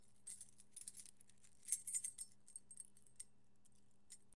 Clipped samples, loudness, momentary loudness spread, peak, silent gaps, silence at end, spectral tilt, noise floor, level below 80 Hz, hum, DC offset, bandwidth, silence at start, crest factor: under 0.1%; -49 LUFS; 19 LU; -26 dBFS; none; 0 s; 0.5 dB/octave; -77 dBFS; -86 dBFS; none; under 0.1%; 12 kHz; 0.25 s; 28 dB